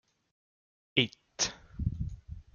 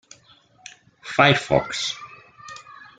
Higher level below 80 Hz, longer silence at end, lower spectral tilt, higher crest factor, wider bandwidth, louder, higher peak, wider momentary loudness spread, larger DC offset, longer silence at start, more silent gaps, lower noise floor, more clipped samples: first, -48 dBFS vs -54 dBFS; about the same, 0.15 s vs 0.2 s; about the same, -3 dB/octave vs -4 dB/octave; first, 28 dB vs 22 dB; about the same, 10 kHz vs 9.4 kHz; second, -33 LUFS vs -20 LUFS; second, -8 dBFS vs -2 dBFS; second, 12 LU vs 25 LU; neither; about the same, 0.95 s vs 1.05 s; neither; first, under -90 dBFS vs -55 dBFS; neither